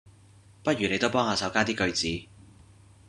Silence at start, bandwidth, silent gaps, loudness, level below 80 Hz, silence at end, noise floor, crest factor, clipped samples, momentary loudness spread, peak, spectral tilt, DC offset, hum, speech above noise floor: 0.05 s; 11.5 kHz; none; -27 LUFS; -58 dBFS; 0.85 s; -55 dBFS; 24 dB; under 0.1%; 7 LU; -6 dBFS; -4 dB/octave; under 0.1%; none; 28 dB